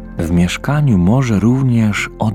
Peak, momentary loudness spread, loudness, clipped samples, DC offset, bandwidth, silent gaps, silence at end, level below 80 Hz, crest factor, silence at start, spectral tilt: 0 dBFS; 4 LU; -14 LUFS; under 0.1%; under 0.1%; 15 kHz; none; 0 s; -32 dBFS; 12 dB; 0 s; -7 dB/octave